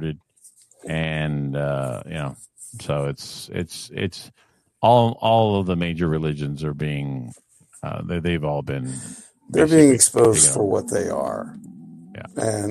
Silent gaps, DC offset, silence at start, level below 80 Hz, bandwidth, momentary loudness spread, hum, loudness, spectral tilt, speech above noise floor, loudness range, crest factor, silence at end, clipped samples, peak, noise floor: none; under 0.1%; 0 s; -48 dBFS; 13 kHz; 23 LU; none; -21 LUFS; -4.5 dB/octave; 32 dB; 10 LU; 20 dB; 0 s; under 0.1%; -2 dBFS; -53 dBFS